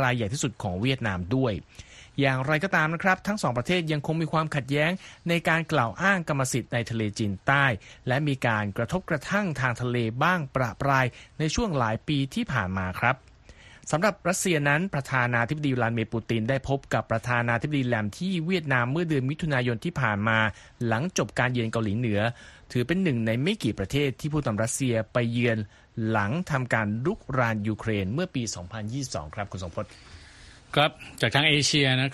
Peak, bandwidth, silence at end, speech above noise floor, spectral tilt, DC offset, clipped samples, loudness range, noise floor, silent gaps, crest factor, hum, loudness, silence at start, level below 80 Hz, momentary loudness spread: -6 dBFS; 13 kHz; 0 s; 24 dB; -5 dB/octave; under 0.1%; under 0.1%; 2 LU; -51 dBFS; none; 20 dB; none; -26 LUFS; 0 s; -52 dBFS; 7 LU